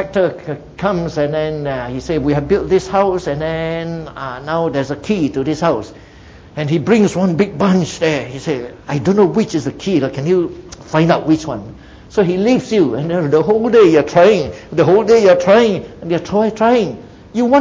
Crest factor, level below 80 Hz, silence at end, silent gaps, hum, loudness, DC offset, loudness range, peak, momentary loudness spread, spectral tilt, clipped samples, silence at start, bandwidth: 14 dB; -42 dBFS; 0 s; none; none; -15 LUFS; under 0.1%; 6 LU; 0 dBFS; 13 LU; -6.5 dB/octave; under 0.1%; 0 s; 8 kHz